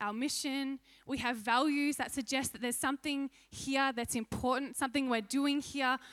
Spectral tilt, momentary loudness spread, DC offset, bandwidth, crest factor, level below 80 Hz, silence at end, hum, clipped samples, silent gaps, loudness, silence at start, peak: -2.5 dB/octave; 7 LU; under 0.1%; 15.5 kHz; 18 dB; -64 dBFS; 0 s; none; under 0.1%; none; -34 LUFS; 0 s; -16 dBFS